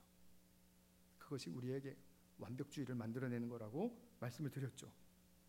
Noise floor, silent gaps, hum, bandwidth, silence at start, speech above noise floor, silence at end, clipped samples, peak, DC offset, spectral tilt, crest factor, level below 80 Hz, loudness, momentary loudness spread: -71 dBFS; none; none; 16 kHz; 0 s; 24 dB; 0.1 s; under 0.1%; -32 dBFS; under 0.1%; -6.5 dB/octave; 18 dB; -80 dBFS; -48 LUFS; 14 LU